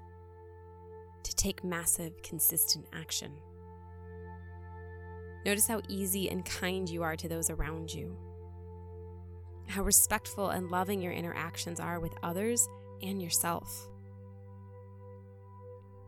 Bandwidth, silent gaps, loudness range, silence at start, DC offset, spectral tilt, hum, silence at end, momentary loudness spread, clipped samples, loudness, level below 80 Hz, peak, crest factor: 18 kHz; none; 5 LU; 0 s; under 0.1%; -3 dB/octave; none; 0 s; 23 LU; under 0.1%; -32 LUFS; -52 dBFS; -12 dBFS; 24 dB